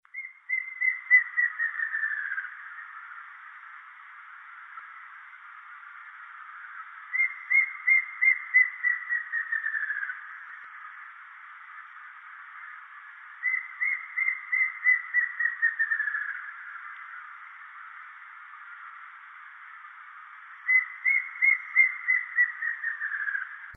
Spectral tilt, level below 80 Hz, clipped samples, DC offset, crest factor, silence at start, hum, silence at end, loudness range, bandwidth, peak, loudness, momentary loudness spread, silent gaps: -0.5 dB/octave; under -90 dBFS; under 0.1%; under 0.1%; 20 dB; 0.15 s; none; 0 s; 19 LU; 3.9 kHz; -10 dBFS; -25 LUFS; 23 LU; none